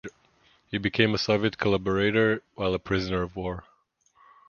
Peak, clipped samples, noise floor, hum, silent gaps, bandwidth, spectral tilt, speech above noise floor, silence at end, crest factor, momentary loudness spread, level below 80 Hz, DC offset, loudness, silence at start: -4 dBFS; under 0.1%; -66 dBFS; none; none; 7.2 kHz; -6 dB/octave; 40 dB; 0.9 s; 22 dB; 12 LU; -50 dBFS; under 0.1%; -26 LUFS; 0.05 s